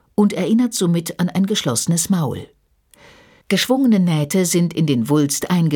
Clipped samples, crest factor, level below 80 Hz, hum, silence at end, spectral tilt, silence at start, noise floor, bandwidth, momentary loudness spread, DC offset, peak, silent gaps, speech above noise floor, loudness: under 0.1%; 14 dB; -56 dBFS; none; 0 s; -5 dB/octave; 0.2 s; -54 dBFS; 19 kHz; 5 LU; under 0.1%; -4 dBFS; none; 37 dB; -18 LUFS